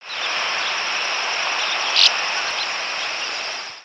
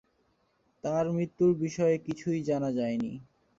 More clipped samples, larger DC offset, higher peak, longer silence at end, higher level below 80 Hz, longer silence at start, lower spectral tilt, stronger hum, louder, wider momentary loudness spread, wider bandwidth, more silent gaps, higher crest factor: neither; neither; first, -2 dBFS vs -16 dBFS; second, 0 s vs 0.35 s; second, -72 dBFS vs -66 dBFS; second, 0 s vs 0.85 s; second, 2 dB/octave vs -7.5 dB/octave; neither; first, -19 LUFS vs -30 LUFS; about the same, 10 LU vs 9 LU; first, 11 kHz vs 7.6 kHz; neither; first, 22 dB vs 16 dB